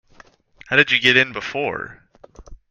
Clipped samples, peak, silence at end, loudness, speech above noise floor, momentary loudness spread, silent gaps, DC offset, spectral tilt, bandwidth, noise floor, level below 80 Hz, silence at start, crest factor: under 0.1%; 0 dBFS; 0.15 s; -17 LUFS; 32 dB; 15 LU; none; under 0.1%; -4 dB/octave; 14 kHz; -51 dBFS; -50 dBFS; 0.7 s; 22 dB